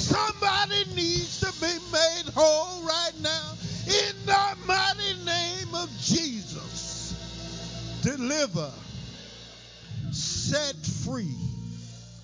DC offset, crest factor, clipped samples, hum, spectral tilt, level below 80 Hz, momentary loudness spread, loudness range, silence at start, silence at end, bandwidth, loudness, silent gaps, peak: under 0.1%; 20 dB; under 0.1%; none; -3 dB/octave; -50 dBFS; 17 LU; 7 LU; 0 s; 0 s; 7.8 kHz; -27 LUFS; none; -8 dBFS